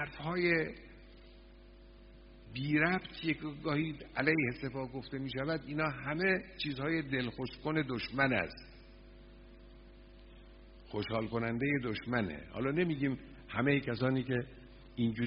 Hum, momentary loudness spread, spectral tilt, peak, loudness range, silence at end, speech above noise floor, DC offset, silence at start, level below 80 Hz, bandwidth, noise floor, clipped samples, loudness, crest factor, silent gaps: none; 11 LU; -5 dB/octave; -12 dBFS; 5 LU; 0 s; 21 dB; under 0.1%; 0 s; -58 dBFS; 5.4 kHz; -56 dBFS; under 0.1%; -35 LUFS; 24 dB; none